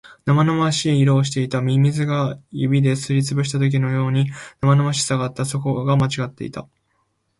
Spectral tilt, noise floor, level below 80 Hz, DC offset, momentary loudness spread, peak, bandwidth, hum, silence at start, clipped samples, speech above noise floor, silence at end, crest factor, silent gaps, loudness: -6 dB/octave; -68 dBFS; -54 dBFS; under 0.1%; 8 LU; -6 dBFS; 11.5 kHz; none; 0.05 s; under 0.1%; 49 dB; 0.75 s; 14 dB; none; -19 LUFS